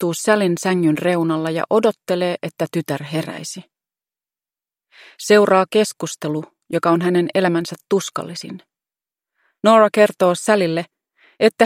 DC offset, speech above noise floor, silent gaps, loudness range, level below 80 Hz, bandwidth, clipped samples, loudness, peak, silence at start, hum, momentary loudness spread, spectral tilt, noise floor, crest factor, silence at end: under 0.1%; over 72 dB; none; 5 LU; -68 dBFS; 16.5 kHz; under 0.1%; -18 LUFS; 0 dBFS; 0 s; none; 14 LU; -5 dB/octave; under -90 dBFS; 18 dB; 0 s